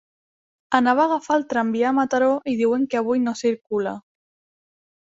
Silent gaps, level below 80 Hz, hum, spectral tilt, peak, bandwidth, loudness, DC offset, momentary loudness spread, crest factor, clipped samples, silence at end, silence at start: none; -66 dBFS; none; -5 dB/octave; -2 dBFS; 7.8 kHz; -21 LUFS; under 0.1%; 7 LU; 20 dB; under 0.1%; 1.15 s; 0.7 s